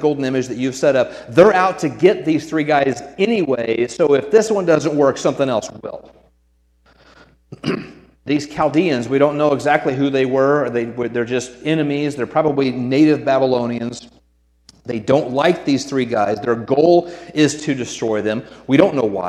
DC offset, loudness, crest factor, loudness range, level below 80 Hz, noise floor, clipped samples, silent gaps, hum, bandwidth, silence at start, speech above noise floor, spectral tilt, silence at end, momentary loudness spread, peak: under 0.1%; -17 LUFS; 16 dB; 5 LU; -56 dBFS; -59 dBFS; under 0.1%; none; none; 12 kHz; 0 s; 42 dB; -5.5 dB/octave; 0 s; 10 LU; 0 dBFS